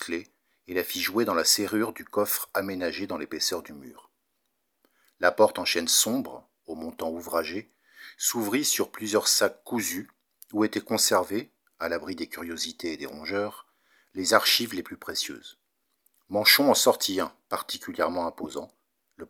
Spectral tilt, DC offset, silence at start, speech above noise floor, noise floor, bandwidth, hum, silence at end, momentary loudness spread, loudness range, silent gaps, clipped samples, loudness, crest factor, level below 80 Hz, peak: -1.5 dB/octave; under 0.1%; 0 s; 51 dB; -78 dBFS; over 20 kHz; none; 0.05 s; 14 LU; 5 LU; none; under 0.1%; -26 LUFS; 26 dB; -68 dBFS; -2 dBFS